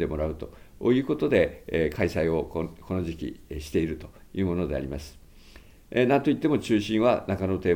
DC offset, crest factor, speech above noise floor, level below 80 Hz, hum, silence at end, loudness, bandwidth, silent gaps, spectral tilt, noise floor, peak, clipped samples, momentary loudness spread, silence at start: under 0.1%; 18 dB; 24 dB; -46 dBFS; none; 0 s; -26 LUFS; 17 kHz; none; -7 dB/octave; -50 dBFS; -8 dBFS; under 0.1%; 14 LU; 0 s